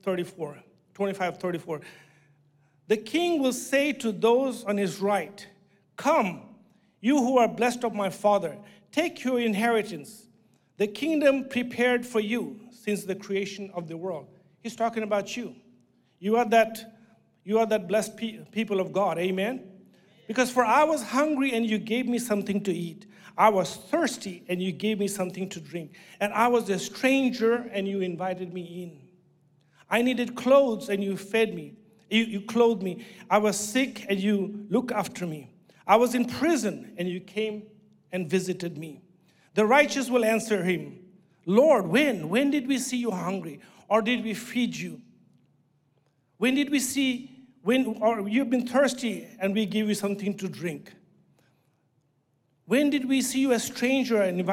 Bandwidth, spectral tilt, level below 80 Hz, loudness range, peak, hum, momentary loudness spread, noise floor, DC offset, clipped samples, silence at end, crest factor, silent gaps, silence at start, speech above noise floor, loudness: 17 kHz; -4.5 dB/octave; -74 dBFS; 5 LU; -6 dBFS; none; 14 LU; -70 dBFS; under 0.1%; under 0.1%; 0 s; 20 dB; none; 0.05 s; 45 dB; -26 LUFS